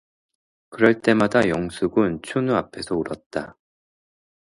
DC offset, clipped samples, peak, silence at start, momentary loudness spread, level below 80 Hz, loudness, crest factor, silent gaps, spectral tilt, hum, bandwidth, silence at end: under 0.1%; under 0.1%; 0 dBFS; 0.7 s; 12 LU; -54 dBFS; -22 LUFS; 22 dB; 3.26-3.30 s; -6.5 dB/octave; none; 11.5 kHz; 1.1 s